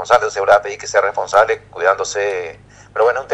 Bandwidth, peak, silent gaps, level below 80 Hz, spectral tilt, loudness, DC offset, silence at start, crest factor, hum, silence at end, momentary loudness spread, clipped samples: 10.5 kHz; 0 dBFS; none; -52 dBFS; -2 dB/octave; -16 LUFS; under 0.1%; 0 s; 16 dB; 50 Hz at -50 dBFS; 0 s; 8 LU; 0.1%